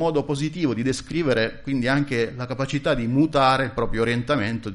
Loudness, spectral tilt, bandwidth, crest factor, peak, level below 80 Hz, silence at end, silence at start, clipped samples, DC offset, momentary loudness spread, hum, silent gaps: -23 LUFS; -6 dB/octave; 11.5 kHz; 16 dB; -6 dBFS; -42 dBFS; 0 s; 0 s; under 0.1%; under 0.1%; 6 LU; none; none